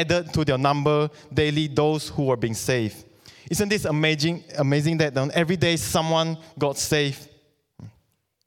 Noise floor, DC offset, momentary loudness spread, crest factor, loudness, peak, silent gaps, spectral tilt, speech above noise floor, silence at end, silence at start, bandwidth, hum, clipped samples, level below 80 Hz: -67 dBFS; under 0.1%; 5 LU; 18 dB; -23 LUFS; -4 dBFS; none; -5 dB/octave; 45 dB; 0.6 s; 0 s; 18 kHz; none; under 0.1%; -50 dBFS